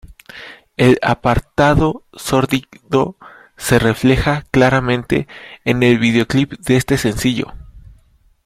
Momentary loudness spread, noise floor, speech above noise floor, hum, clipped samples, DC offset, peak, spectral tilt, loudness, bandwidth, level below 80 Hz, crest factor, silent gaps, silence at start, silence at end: 12 LU; -52 dBFS; 37 dB; none; under 0.1%; under 0.1%; 0 dBFS; -6 dB/octave; -16 LUFS; 16 kHz; -34 dBFS; 16 dB; none; 0.05 s; 0.55 s